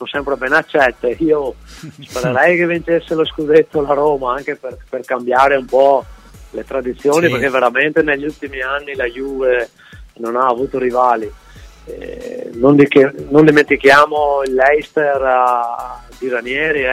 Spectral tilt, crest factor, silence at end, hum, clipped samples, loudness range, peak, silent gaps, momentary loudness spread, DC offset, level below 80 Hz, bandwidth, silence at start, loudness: -5.5 dB/octave; 14 dB; 0 s; none; under 0.1%; 6 LU; 0 dBFS; none; 17 LU; under 0.1%; -42 dBFS; 15.5 kHz; 0 s; -14 LUFS